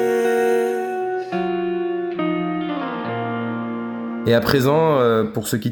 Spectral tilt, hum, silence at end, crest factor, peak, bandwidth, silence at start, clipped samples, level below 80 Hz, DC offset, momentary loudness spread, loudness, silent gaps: -6 dB/octave; none; 0 s; 18 dB; -2 dBFS; over 20 kHz; 0 s; under 0.1%; -54 dBFS; under 0.1%; 9 LU; -21 LUFS; none